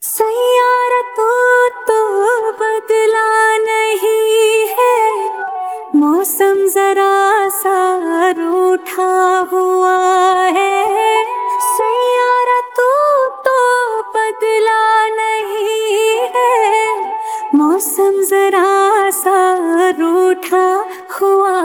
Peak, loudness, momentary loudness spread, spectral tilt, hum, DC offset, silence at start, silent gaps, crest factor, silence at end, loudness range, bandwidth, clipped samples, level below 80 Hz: 0 dBFS; -13 LUFS; 5 LU; -1 dB/octave; none; under 0.1%; 0 s; none; 12 dB; 0 s; 1 LU; 19.5 kHz; under 0.1%; -68 dBFS